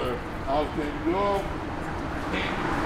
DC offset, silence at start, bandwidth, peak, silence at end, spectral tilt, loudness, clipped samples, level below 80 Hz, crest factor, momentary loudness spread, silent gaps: under 0.1%; 0 s; 16 kHz; -14 dBFS; 0 s; -6 dB/octave; -29 LUFS; under 0.1%; -40 dBFS; 14 dB; 7 LU; none